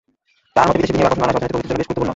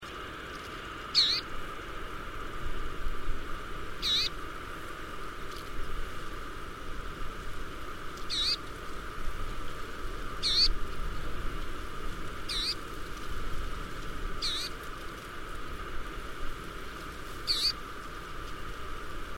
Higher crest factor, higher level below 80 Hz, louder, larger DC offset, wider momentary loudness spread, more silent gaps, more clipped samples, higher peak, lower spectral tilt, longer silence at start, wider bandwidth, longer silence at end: about the same, 16 dB vs 20 dB; about the same, -40 dBFS vs -40 dBFS; first, -18 LUFS vs -35 LUFS; neither; second, 6 LU vs 14 LU; neither; neither; first, -2 dBFS vs -14 dBFS; first, -6.5 dB/octave vs -2.5 dB/octave; first, 0.55 s vs 0 s; second, 8 kHz vs 16 kHz; about the same, 0 s vs 0 s